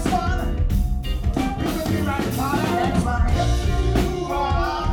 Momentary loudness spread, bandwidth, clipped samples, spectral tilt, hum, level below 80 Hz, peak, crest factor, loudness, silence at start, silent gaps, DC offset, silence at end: 3 LU; 18 kHz; under 0.1%; -6 dB/octave; none; -24 dBFS; -8 dBFS; 14 dB; -22 LUFS; 0 s; none; under 0.1%; 0 s